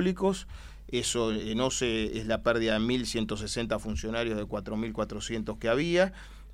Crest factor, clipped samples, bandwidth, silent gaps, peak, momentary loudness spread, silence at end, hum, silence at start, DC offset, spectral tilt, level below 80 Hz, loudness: 18 dB; under 0.1%; 15.5 kHz; none; -12 dBFS; 8 LU; 0 s; none; 0 s; under 0.1%; -4.5 dB/octave; -44 dBFS; -30 LUFS